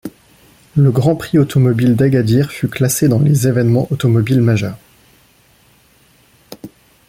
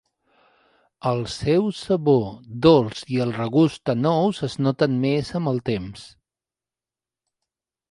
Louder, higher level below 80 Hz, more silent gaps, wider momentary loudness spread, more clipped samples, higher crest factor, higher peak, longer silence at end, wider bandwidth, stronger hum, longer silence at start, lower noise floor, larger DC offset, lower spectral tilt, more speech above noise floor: first, -14 LUFS vs -22 LUFS; first, -46 dBFS vs -52 dBFS; neither; about the same, 11 LU vs 9 LU; neither; second, 14 dB vs 20 dB; about the same, -2 dBFS vs -2 dBFS; second, 0.4 s vs 1.85 s; first, 16 kHz vs 11.5 kHz; neither; second, 0.05 s vs 1.05 s; second, -51 dBFS vs under -90 dBFS; neither; about the same, -7 dB/octave vs -7 dB/octave; second, 38 dB vs over 69 dB